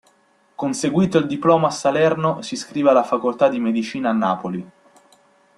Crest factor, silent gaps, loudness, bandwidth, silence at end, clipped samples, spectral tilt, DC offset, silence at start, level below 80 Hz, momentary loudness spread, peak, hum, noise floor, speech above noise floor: 18 dB; none; -19 LUFS; 12 kHz; 0.9 s; under 0.1%; -6 dB/octave; under 0.1%; 0.6 s; -60 dBFS; 10 LU; -2 dBFS; none; -59 dBFS; 40 dB